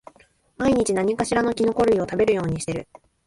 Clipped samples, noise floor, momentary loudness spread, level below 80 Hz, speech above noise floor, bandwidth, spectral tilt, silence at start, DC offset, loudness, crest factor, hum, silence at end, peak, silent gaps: under 0.1%; -57 dBFS; 7 LU; -48 dBFS; 36 dB; 11.5 kHz; -5.5 dB/octave; 0.6 s; under 0.1%; -22 LUFS; 16 dB; none; 0.45 s; -6 dBFS; none